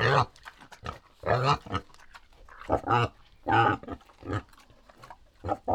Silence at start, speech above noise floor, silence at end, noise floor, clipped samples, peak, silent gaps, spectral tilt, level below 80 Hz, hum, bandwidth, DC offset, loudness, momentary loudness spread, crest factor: 0 s; 30 dB; 0 s; -56 dBFS; under 0.1%; -8 dBFS; none; -6 dB/octave; -50 dBFS; none; 11 kHz; under 0.1%; -29 LUFS; 18 LU; 22 dB